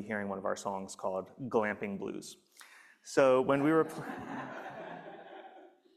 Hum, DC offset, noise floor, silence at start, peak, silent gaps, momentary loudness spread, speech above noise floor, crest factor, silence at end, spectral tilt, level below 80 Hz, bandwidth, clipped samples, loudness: none; under 0.1%; -57 dBFS; 0 s; -12 dBFS; none; 22 LU; 24 dB; 22 dB; 0.3 s; -5.5 dB/octave; -76 dBFS; 14 kHz; under 0.1%; -33 LUFS